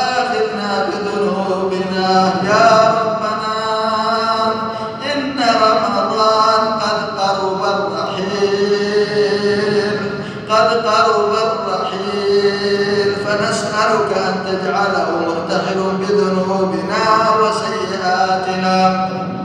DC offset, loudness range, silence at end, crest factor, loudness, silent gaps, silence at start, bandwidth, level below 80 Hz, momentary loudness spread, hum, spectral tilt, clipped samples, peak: under 0.1%; 2 LU; 0 s; 16 dB; -16 LUFS; none; 0 s; 10.5 kHz; -54 dBFS; 7 LU; none; -4.5 dB/octave; under 0.1%; 0 dBFS